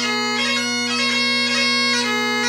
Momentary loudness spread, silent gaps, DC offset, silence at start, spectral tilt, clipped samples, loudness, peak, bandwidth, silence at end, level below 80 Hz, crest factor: 3 LU; none; under 0.1%; 0 s; -1 dB/octave; under 0.1%; -17 LUFS; -8 dBFS; 16 kHz; 0 s; -68 dBFS; 12 dB